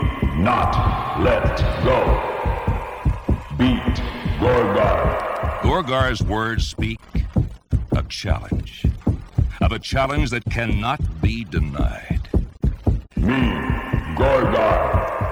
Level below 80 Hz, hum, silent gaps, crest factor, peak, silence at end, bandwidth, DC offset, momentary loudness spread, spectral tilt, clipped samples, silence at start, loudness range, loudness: -26 dBFS; none; none; 16 dB; -4 dBFS; 0 s; 13.5 kHz; 0.1%; 7 LU; -7 dB/octave; under 0.1%; 0 s; 3 LU; -21 LUFS